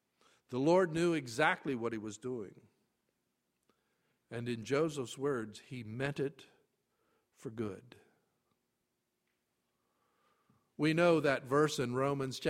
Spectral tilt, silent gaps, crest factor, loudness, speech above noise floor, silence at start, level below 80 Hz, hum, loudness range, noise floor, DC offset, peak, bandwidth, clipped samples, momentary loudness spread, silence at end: -5.5 dB/octave; none; 22 dB; -34 LUFS; 50 dB; 0.5 s; -74 dBFS; none; 16 LU; -84 dBFS; under 0.1%; -14 dBFS; 15.5 kHz; under 0.1%; 16 LU; 0 s